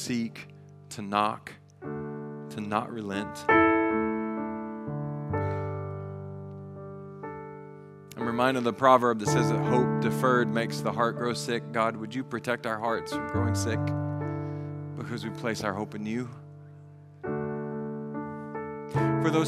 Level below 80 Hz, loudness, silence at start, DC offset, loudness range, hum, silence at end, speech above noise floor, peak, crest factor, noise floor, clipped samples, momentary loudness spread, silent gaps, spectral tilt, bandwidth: -62 dBFS; -29 LUFS; 0 s; under 0.1%; 10 LU; none; 0 s; 22 dB; -6 dBFS; 24 dB; -49 dBFS; under 0.1%; 18 LU; none; -6 dB/octave; 14.5 kHz